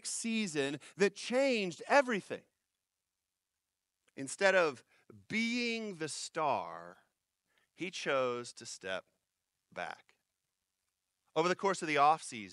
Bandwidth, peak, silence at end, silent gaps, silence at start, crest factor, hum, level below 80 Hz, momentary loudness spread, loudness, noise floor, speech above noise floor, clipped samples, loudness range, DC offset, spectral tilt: 12 kHz; -14 dBFS; 0 s; none; 0.05 s; 22 dB; none; -86 dBFS; 16 LU; -34 LUFS; -90 dBFS; 55 dB; under 0.1%; 6 LU; under 0.1%; -3.5 dB/octave